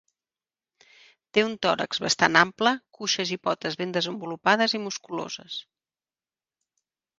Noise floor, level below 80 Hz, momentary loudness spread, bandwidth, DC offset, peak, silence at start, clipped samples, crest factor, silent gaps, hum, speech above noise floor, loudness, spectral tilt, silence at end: under -90 dBFS; -70 dBFS; 13 LU; 10 kHz; under 0.1%; 0 dBFS; 1.35 s; under 0.1%; 28 dB; none; none; over 64 dB; -25 LUFS; -3 dB/octave; 1.6 s